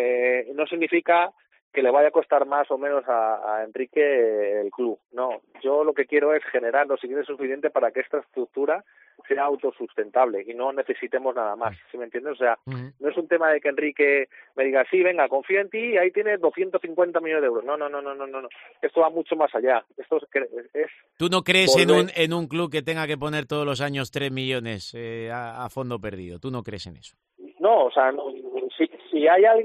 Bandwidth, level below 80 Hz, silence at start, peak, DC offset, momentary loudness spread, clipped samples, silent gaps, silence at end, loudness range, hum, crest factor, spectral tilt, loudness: 13 kHz; -66 dBFS; 0 s; -2 dBFS; under 0.1%; 13 LU; under 0.1%; 1.62-1.71 s; 0 s; 6 LU; none; 20 dB; -5 dB/octave; -23 LUFS